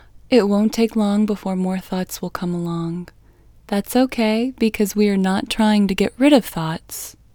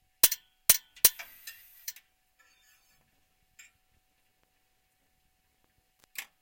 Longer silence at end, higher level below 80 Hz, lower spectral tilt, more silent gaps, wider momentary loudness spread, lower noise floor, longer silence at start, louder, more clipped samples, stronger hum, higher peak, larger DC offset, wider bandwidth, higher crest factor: about the same, 0.25 s vs 0.2 s; first, -48 dBFS vs -64 dBFS; first, -5.5 dB/octave vs 1.5 dB/octave; neither; second, 10 LU vs 21 LU; second, -49 dBFS vs -73 dBFS; about the same, 0.3 s vs 0.25 s; first, -19 LUFS vs -24 LUFS; neither; neither; about the same, 0 dBFS vs -2 dBFS; neither; first, over 20 kHz vs 17 kHz; second, 18 dB vs 32 dB